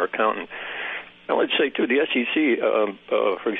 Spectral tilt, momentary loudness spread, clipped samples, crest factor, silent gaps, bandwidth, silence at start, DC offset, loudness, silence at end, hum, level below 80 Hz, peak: -7.5 dB/octave; 10 LU; under 0.1%; 16 dB; none; 4 kHz; 0 s; under 0.1%; -23 LUFS; 0 s; none; -72 dBFS; -6 dBFS